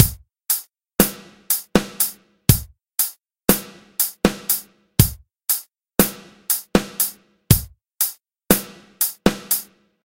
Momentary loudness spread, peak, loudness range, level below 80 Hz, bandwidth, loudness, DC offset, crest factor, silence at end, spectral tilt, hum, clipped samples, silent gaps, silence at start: 6 LU; 0 dBFS; 1 LU; -36 dBFS; 17 kHz; -20 LUFS; under 0.1%; 22 dB; 0.4 s; -4 dB/octave; none; under 0.1%; none; 0 s